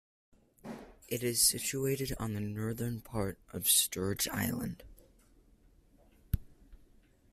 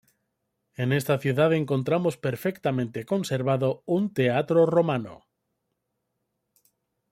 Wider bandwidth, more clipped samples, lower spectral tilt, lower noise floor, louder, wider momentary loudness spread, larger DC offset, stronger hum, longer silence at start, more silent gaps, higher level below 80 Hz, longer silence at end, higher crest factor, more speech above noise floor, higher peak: about the same, 16 kHz vs 16.5 kHz; neither; second, -3 dB/octave vs -7 dB/octave; second, -64 dBFS vs -79 dBFS; second, -32 LUFS vs -25 LUFS; first, 21 LU vs 8 LU; neither; neither; second, 0.65 s vs 0.8 s; neither; first, -52 dBFS vs -66 dBFS; second, 0.55 s vs 1.95 s; first, 22 dB vs 16 dB; second, 30 dB vs 55 dB; second, -14 dBFS vs -10 dBFS